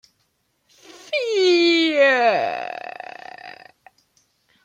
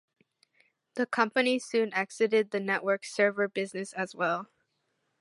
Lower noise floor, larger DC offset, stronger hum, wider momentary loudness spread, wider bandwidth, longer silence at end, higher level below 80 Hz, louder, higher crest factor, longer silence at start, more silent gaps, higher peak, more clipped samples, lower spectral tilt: second, -69 dBFS vs -78 dBFS; neither; neither; first, 22 LU vs 8 LU; second, 9.2 kHz vs 11.5 kHz; first, 1.15 s vs 0.75 s; first, -76 dBFS vs -86 dBFS; first, -18 LUFS vs -29 LUFS; about the same, 18 dB vs 22 dB; first, 1.1 s vs 0.95 s; neither; first, -4 dBFS vs -8 dBFS; neither; about the same, -3 dB/octave vs -4 dB/octave